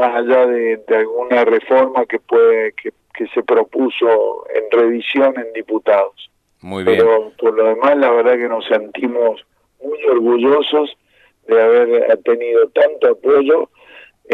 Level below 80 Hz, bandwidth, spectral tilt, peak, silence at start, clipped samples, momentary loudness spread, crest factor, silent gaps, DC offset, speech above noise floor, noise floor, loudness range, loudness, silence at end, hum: -66 dBFS; 4.3 kHz; -6.5 dB/octave; 0 dBFS; 0 s; under 0.1%; 10 LU; 14 dB; none; under 0.1%; 29 dB; -43 dBFS; 2 LU; -14 LUFS; 0 s; none